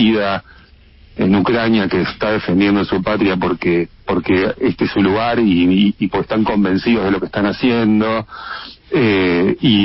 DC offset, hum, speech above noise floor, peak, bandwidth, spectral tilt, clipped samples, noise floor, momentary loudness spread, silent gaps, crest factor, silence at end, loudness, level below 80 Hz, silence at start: under 0.1%; none; 30 dB; -2 dBFS; 5.8 kHz; -10.5 dB/octave; under 0.1%; -45 dBFS; 7 LU; none; 14 dB; 0 s; -16 LUFS; -42 dBFS; 0 s